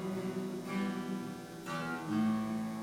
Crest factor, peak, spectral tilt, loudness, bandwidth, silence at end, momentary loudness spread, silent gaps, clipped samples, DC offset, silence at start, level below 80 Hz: 12 dB; -24 dBFS; -6 dB/octave; -37 LUFS; 16.5 kHz; 0 s; 8 LU; none; under 0.1%; under 0.1%; 0 s; -72 dBFS